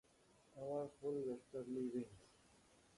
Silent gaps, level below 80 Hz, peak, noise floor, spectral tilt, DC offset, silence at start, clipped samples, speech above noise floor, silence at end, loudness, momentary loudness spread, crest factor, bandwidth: none; -80 dBFS; -34 dBFS; -72 dBFS; -7.5 dB/octave; under 0.1%; 0.55 s; under 0.1%; 26 dB; 0.7 s; -47 LUFS; 12 LU; 14 dB; 11.5 kHz